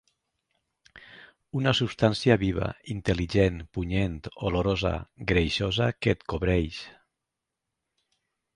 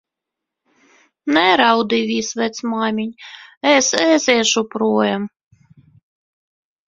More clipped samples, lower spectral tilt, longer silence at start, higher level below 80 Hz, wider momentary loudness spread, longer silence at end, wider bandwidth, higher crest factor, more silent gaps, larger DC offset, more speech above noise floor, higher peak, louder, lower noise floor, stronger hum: neither; first, -6.5 dB/octave vs -2.5 dB/octave; second, 0.95 s vs 1.25 s; first, -42 dBFS vs -62 dBFS; second, 9 LU vs 14 LU; about the same, 1.65 s vs 1.6 s; first, 10.5 kHz vs 7.8 kHz; about the same, 22 dB vs 20 dB; second, none vs 3.57-3.61 s; neither; second, 59 dB vs 66 dB; second, -6 dBFS vs 0 dBFS; second, -27 LUFS vs -16 LUFS; about the same, -86 dBFS vs -83 dBFS; neither